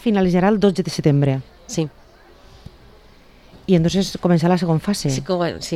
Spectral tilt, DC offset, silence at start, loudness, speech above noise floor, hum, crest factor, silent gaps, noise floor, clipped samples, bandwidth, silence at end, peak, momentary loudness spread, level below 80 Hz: -6.5 dB/octave; under 0.1%; 0 s; -19 LUFS; 30 dB; none; 18 dB; none; -47 dBFS; under 0.1%; 13 kHz; 0 s; -2 dBFS; 9 LU; -44 dBFS